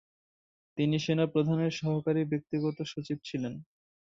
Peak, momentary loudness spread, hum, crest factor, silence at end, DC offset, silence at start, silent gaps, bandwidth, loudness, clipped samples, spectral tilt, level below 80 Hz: -14 dBFS; 10 LU; none; 18 dB; 0.4 s; under 0.1%; 0.75 s; none; 7.6 kHz; -31 LUFS; under 0.1%; -7 dB/octave; -70 dBFS